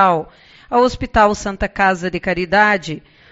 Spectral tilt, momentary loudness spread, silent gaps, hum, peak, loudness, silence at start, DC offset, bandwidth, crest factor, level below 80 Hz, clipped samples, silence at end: -3.5 dB/octave; 10 LU; none; none; 0 dBFS; -16 LUFS; 0 s; under 0.1%; 8 kHz; 16 dB; -36 dBFS; under 0.1%; 0.35 s